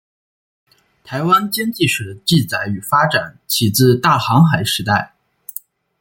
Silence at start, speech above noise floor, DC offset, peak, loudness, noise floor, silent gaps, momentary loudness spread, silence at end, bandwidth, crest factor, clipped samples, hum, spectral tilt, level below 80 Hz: 1.05 s; 21 dB; under 0.1%; -2 dBFS; -15 LUFS; -37 dBFS; none; 18 LU; 0.95 s; 17 kHz; 16 dB; under 0.1%; none; -4.5 dB/octave; -54 dBFS